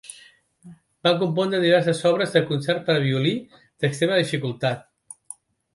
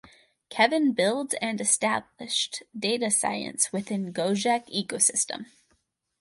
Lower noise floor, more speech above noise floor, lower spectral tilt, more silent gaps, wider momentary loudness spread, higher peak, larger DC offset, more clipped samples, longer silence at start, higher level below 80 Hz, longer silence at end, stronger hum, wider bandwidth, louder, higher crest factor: second, -53 dBFS vs -71 dBFS; second, 31 dB vs 45 dB; first, -5.5 dB/octave vs -2 dB/octave; neither; first, 19 LU vs 9 LU; first, -4 dBFS vs -8 dBFS; neither; neither; second, 0.1 s vs 0.5 s; first, -66 dBFS vs -72 dBFS; first, 0.95 s vs 0.75 s; neither; about the same, 11.5 kHz vs 12 kHz; first, -22 LUFS vs -25 LUFS; about the same, 20 dB vs 20 dB